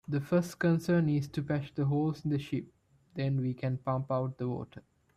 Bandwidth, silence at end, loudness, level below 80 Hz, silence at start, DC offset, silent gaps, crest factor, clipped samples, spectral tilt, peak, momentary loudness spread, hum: 14 kHz; 0.35 s; -32 LUFS; -64 dBFS; 0.1 s; under 0.1%; none; 14 dB; under 0.1%; -8 dB/octave; -18 dBFS; 9 LU; none